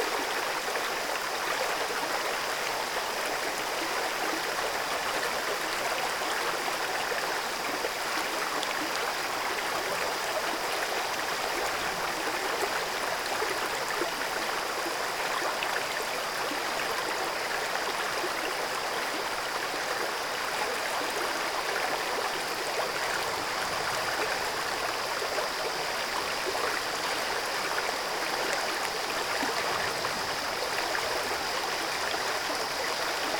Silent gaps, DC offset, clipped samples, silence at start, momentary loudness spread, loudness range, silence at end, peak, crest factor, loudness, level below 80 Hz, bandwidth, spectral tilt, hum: none; under 0.1%; under 0.1%; 0 s; 1 LU; 1 LU; 0 s; -12 dBFS; 20 dB; -29 LUFS; -60 dBFS; over 20 kHz; -1 dB/octave; none